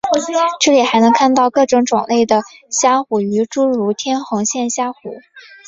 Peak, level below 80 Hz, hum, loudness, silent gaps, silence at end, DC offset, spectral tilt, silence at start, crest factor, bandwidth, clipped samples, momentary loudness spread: 0 dBFS; -58 dBFS; none; -15 LUFS; none; 0.25 s; under 0.1%; -3.5 dB/octave; 0.05 s; 14 dB; 8 kHz; under 0.1%; 9 LU